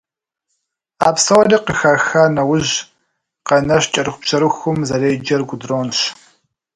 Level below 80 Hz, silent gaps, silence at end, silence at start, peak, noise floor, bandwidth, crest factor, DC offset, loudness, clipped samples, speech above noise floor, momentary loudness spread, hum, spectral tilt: -50 dBFS; none; 0.65 s; 1 s; 0 dBFS; -75 dBFS; 11.5 kHz; 16 dB; under 0.1%; -15 LUFS; under 0.1%; 60 dB; 8 LU; none; -4 dB/octave